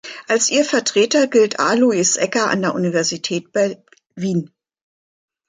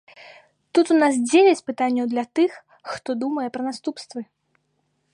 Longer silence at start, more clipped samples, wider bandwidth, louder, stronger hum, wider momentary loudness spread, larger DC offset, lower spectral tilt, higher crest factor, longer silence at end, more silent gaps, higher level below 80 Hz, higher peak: second, 0.05 s vs 0.2 s; neither; second, 9.6 kHz vs 11 kHz; first, -17 LUFS vs -21 LUFS; neither; second, 8 LU vs 18 LU; neither; about the same, -3.5 dB/octave vs -3.5 dB/octave; about the same, 16 dB vs 18 dB; about the same, 1 s vs 0.9 s; neither; first, -66 dBFS vs -74 dBFS; about the same, -4 dBFS vs -4 dBFS